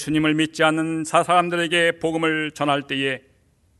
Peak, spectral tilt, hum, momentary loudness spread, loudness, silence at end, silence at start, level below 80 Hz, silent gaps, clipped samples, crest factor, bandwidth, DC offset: -2 dBFS; -4.5 dB/octave; none; 6 LU; -20 LUFS; 0.6 s; 0 s; -58 dBFS; none; under 0.1%; 18 dB; 12 kHz; under 0.1%